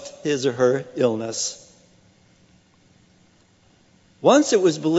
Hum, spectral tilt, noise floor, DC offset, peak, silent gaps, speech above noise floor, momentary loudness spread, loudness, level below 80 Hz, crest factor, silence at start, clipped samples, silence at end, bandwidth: none; -4.5 dB/octave; -57 dBFS; under 0.1%; -2 dBFS; none; 38 dB; 10 LU; -20 LUFS; -68 dBFS; 20 dB; 0 s; under 0.1%; 0 s; 8.2 kHz